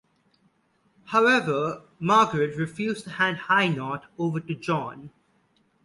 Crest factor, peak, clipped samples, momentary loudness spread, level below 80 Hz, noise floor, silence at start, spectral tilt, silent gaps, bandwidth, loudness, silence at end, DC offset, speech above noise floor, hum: 20 dB; -8 dBFS; under 0.1%; 11 LU; -66 dBFS; -67 dBFS; 1.05 s; -5.5 dB/octave; none; 11.5 kHz; -24 LUFS; 0.75 s; under 0.1%; 43 dB; none